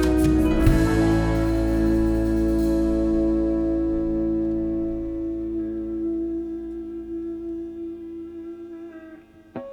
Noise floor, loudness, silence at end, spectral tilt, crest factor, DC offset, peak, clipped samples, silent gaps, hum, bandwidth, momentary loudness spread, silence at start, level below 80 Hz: -46 dBFS; -23 LUFS; 0 s; -8 dB/octave; 18 dB; under 0.1%; -4 dBFS; under 0.1%; none; none; 19 kHz; 17 LU; 0 s; -30 dBFS